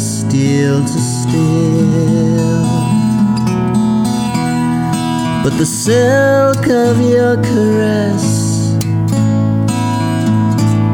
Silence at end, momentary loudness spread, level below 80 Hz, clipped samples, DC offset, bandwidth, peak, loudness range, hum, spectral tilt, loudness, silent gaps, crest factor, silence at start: 0 s; 4 LU; -42 dBFS; under 0.1%; under 0.1%; 17 kHz; -2 dBFS; 2 LU; none; -6.5 dB/octave; -13 LUFS; none; 10 dB; 0 s